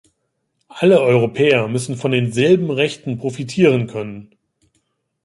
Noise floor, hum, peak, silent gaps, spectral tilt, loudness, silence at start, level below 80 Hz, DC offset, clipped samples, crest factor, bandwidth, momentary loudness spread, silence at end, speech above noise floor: -71 dBFS; none; -2 dBFS; none; -6 dB/octave; -17 LUFS; 0.75 s; -58 dBFS; under 0.1%; under 0.1%; 16 dB; 11.5 kHz; 11 LU; 1 s; 55 dB